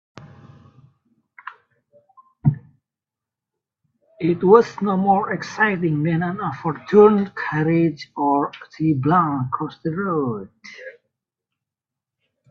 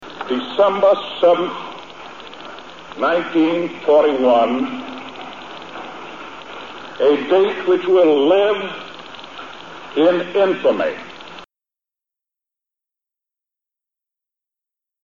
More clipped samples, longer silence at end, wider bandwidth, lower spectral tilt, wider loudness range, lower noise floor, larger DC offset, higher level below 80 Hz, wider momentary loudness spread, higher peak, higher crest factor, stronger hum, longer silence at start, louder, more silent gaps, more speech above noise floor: neither; second, 1.6 s vs 3.6 s; about the same, 7 kHz vs 7.4 kHz; first, -8.5 dB/octave vs -5.5 dB/octave; first, 13 LU vs 4 LU; about the same, -88 dBFS vs -89 dBFS; second, under 0.1% vs 0.5%; about the same, -60 dBFS vs -62 dBFS; first, 24 LU vs 20 LU; first, 0 dBFS vs -4 dBFS; first, 22 dB vs 16 dB; neither; first, 0.2 s vs 0 s; second, -20 LUFS vs -17 LUFS; neither; second, 68 dB vs 73 dB